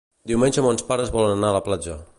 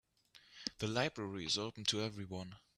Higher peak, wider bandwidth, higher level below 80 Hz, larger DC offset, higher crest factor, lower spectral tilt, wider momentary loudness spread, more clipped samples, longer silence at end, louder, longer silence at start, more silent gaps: first, -6 dBFS vs -20 dBFS; second, 11.5 kHz vs 13.5 kHz; first, -42 dBFS vs -70 dBFS; neither; second, 16 dB vs 22 dB; first, -5 dB/octave vs -3.5 dB/octave; second, 7 LU vs 10 LU; neither; about the same, 0.15 s vs 0.2 s; first, -21 LUFS vs -39 LUFS; about the same, 0.25 s vs 0.35 s; neither